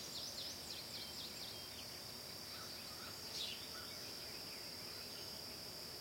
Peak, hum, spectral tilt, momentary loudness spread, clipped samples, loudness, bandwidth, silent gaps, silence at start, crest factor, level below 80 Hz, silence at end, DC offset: -32 dBFS; none; -1.5 dB/octave; 4 LU; under 0.1%; -47 LUFS; 16.5 kHz; none; 0 s; 18 dB; -74 dBFS; 0 s; under 0.1%